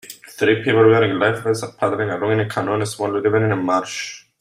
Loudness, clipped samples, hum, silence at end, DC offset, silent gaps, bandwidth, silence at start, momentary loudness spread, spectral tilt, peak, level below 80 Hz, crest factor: -19 LUFS; under 0.1%; none; 0.25 s; under 0.1%; none; 16 kHz; 0.05 s; 9 LU; -5.5 dB/octave; -2 dBFS; -60 dBFS; 16 dB